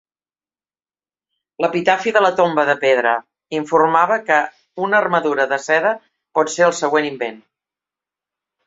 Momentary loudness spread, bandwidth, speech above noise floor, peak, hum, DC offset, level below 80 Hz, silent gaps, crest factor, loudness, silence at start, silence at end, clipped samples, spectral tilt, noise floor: 11 LU; 8 kHz; over 73 dB; -2 dBFS; 50 Hz at -65 dBFS; under 0.1%; -68 dBFS; none; 18 dB; -17 LUFS; 1.6 s; 1.3 s; under 0.1%; -4 dB/octave; under -90 dBFS